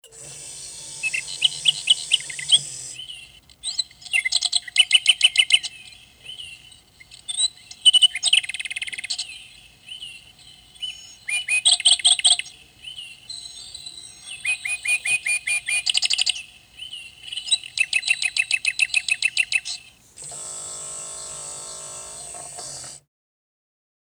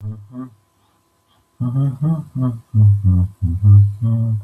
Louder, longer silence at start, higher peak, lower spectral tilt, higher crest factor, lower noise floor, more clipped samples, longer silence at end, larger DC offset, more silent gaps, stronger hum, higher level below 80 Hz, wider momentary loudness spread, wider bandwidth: second, -19 LUFS vs -16 LUFS; about the same, 0.05 s vs 0 s; about the same, -2 dBFS vs -2 dBFS; second, 3 dB/octave vs -11.5 dB/octave; first, 22 dB vs 14 dB; second, -49 dBFS vs -60 dBFS; neither; first, 1.05 s vs 0 s; neither; neither; neither; second, -64 dBFS vs -38 dBFS; about the same, 21 LU vs 20 LU; first, over 20 kHz vs 1.4 kHz